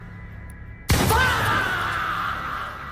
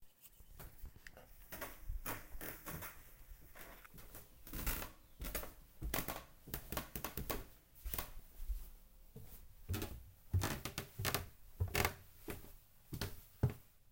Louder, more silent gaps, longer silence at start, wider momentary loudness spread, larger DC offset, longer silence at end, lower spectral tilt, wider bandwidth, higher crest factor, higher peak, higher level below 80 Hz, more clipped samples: first, -22 LUFS vs -45 LUFS; neither; about the same, 0 s vs 0 s; about the same, 21 LU vs 19 LU; neither; about the same, 0 s vs 0 s; about the same, -4 dB/octave vs -4 dB/octave; about the same, 16 kHz vs 17 kHz; second, 18 dB vs 32 dB; first, -6 dBFS vs -12 dBFS; first, -34 dBFS vs -52 dBFS; neither